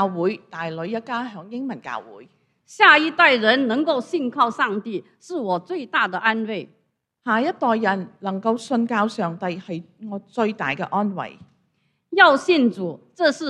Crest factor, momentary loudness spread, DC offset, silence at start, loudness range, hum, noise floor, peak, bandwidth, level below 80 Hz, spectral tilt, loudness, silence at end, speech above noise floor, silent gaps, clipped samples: 22 dB; 18 LU; under 0.1%; 0 s; 6 LU; none; -69 dBFS; 0 dBFS; 10.5 kHz; -72 dBFS; -5 dB/octave; -20 LUFS; 0 s; 47 dB; none; under 0.1%